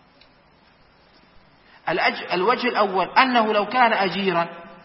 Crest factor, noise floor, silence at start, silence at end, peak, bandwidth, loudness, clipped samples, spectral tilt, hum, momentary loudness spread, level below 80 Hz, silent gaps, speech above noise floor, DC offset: 20 dB; -55 dBFS; 1.85 s; 0.1 s; -2 dBFS; 5.8 kHz; -20 LUFS; under 0.1%; -9 dB/octave; none; 8 LU; -64 dBFS; none; 35 dB; under 0.1%